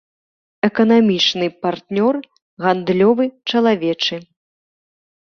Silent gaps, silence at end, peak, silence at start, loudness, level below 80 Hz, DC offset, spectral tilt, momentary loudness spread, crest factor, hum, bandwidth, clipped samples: 2.42-2.57 s; 1.15 s; -2 dBFS; 0.65 s; -17 LUFS; -62 dBFS; under 0.1%; -5.5 dB/octave; 8 LU; 16 dB; none; 6.6 kHz; under 0.1%